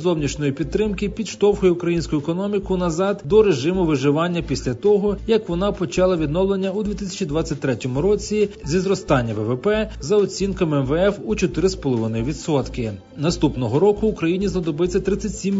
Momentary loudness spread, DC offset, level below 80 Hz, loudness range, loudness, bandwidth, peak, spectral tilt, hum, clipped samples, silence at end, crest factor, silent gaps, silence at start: 6 LU; under 0.1%; -36 dBFS; 2 LU; -21 LUFS; 7.8 kHz; -4 dBFS; -6 dB/octave; none; under 0.1%; 0 s; 16 dB; none; 0 s